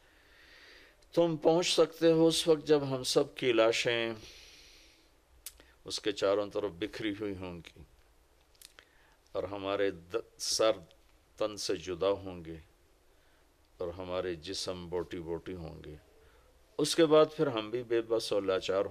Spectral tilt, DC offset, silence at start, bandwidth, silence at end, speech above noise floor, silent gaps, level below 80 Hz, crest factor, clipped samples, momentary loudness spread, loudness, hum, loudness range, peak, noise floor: -4 dB/octave; under 0.1%; 1.15 s; 15 kHz; 0 s; 34 dB; none; -64 dBFS; 20 dB; under 0.1%; 20 LU; -31 LUFS; none; 12 LU; -14 dBFS; -65 dBFS